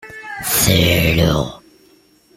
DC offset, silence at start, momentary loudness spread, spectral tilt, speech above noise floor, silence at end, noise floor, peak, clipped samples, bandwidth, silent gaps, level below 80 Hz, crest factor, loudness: under 0.1%; 0.05 s; 14 LU; -4 dB/octave; 37 dB; 0.8 s; -52 dBFS; -2 dBFS; under 0.1%; 16.5 kHz; none; -34 dBFS; 16 dB; -15 LUFS